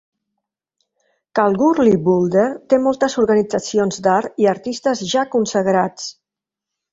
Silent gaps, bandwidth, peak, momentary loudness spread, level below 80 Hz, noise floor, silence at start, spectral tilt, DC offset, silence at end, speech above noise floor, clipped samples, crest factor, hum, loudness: none; 8 kHz; -2 dBFS; 6 LU; -56 dBFS; -86 dBFS; 1.35 s; -5.5 dB/octave; under 0.1%; 0.8 s; 70 dB; under 0.1%; 16 dB; none; -17 LUFS